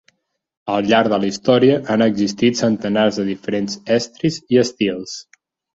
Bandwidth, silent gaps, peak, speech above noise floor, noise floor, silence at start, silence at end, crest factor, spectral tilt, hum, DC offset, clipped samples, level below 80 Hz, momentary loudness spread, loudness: 8 kHz; none; -2 dBFS; 45 dB; -62 dBFS; 0.65 s; 0.55 s; 16 dB; -5 dB/octave; none; under 0.1%; under 0.1%; -56 dBFS; 8 LU; -17 LUFS